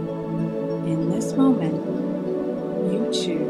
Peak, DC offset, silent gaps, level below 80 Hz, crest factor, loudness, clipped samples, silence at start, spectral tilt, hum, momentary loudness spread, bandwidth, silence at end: -8 dBFS; under 0.1%; none; -58 dBFS; 16 dB; -24 LUFS; under 0.1%; 0 s; -6.5 dB/octave; none; 7 LU; 12.5 kHz; 0 s